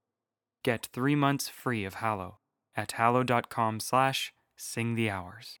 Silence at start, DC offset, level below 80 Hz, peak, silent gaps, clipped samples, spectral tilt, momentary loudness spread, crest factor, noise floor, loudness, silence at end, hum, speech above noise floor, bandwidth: 0.65 s; under 0.1%; -74 dBFS; -8 dBFS; none; under 0.1%; -5 dB/octave; 12 LU; 22 dB; under -90 dBFS; -30 LUFS; 0.05 s; none; over 60 dB; over 20 kHz